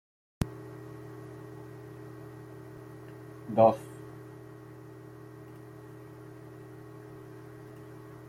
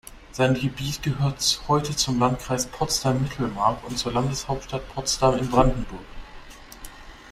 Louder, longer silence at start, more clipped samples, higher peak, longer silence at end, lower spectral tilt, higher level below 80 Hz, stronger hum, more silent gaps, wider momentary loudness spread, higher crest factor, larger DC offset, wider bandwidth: second, -31 LUFS vs -24 LUFS; first, 0.4 s vs 0.05 s; neither; second, -10 dBFS vs -4 dBFS; about the same, 0 s vs 0 s; first, -7.5 dB/octave vs -4.5 dB/octave; second, -58 dBFS vs -38 dBFS; neither; neither; second, 16 LU vs 21 LU; first, 26 dB vs 20 dB; neither; about the same, 16 kHz vs 16 kHz